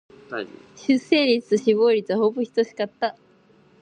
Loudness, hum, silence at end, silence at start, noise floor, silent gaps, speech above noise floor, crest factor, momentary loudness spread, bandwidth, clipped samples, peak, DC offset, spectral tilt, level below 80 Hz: -22 LUFS; none; 0.7 s; 0.3 s; -56 dBFS; none; 34 dB; 18 dB; 14 LU; 9 kHz; under 0.1%; -4 dBFS; under 0.1%; -5 dB/octave; -70 dBFS